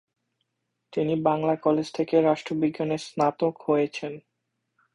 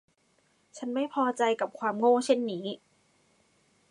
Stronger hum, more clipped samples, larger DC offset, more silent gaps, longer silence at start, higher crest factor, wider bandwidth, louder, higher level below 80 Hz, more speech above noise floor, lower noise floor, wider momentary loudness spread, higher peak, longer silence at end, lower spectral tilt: neither; neither; neither; neither; first, 0.9 s vs 0.75 s; about the same, 18 dB vs 20 dB; about the same, 11 kHz vs 11.5 kHz; first, -25 LUFS vs -28 LUFS; first, -66 dBFS vs -84 dBFS; first, 55 dB vs 42 dB; first, -80 dBFS vs -69 dBFS; second, 9 LU vs 14 LU; about the same, -8 dBFS vs -10 dBFS; second, 0.75 s vs 1.15 s; first, -7 dB/octave vs -4.5 dB/octave